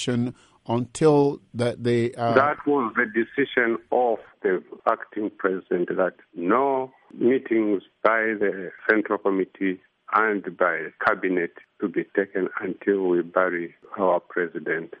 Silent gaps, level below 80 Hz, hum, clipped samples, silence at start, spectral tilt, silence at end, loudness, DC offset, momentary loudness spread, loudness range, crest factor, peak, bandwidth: none; -66 dBFS; none; under 0.1%; 0 s; -6.5 dB/octave; 0.05 s; -24 LUFS; under 0.1%; 7 LU; 3 LU; 20 dB; -4 dBFS; 11 kHz